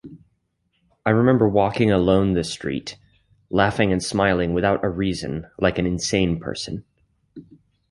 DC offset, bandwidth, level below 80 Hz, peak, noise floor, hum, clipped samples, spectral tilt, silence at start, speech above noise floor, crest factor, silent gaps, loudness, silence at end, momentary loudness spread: under 0.1%; 11.5 kHz; -42 dBFS; -2 dBFS; -70 dBFS; none; under 0.1%; -6 dB/octave; 0.05 s; 50 dB; 20 dB; none; -21 LUFS; 0.5 s; 12 LU